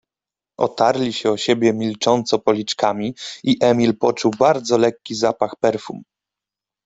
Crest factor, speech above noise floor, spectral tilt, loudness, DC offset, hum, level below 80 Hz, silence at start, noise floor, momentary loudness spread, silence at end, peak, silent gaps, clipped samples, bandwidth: 16 dB; 71 dB; -5 dB/octave; -19 LUFS; under 0.1%; none; -60 dBFS; 0.6 s; -89 dBFS; 8 LU; 0.85 s; -2 dBFS; none; under 0.1%; 8.2 kHz